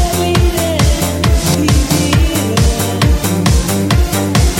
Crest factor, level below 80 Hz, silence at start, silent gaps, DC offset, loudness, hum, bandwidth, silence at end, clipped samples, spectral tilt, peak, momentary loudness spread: 12 dB; -16 dBFS; 0 s; none; under 0.1%; -13 LUFS; none; 17 kHz; 0 s; under 0.1%; -5 dB/octave; 0 dBFS; 2 LU